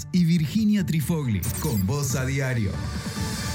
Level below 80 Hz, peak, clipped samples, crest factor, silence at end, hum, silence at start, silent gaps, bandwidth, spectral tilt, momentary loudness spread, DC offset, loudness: -40 dBFS; -12 dBFS; under 0.1%; 12 dB; 0 s; none; 0 s; none; 19.5 kHz; -5.5 dB/octave; 7 LU; under 0.1%; -25 LUFS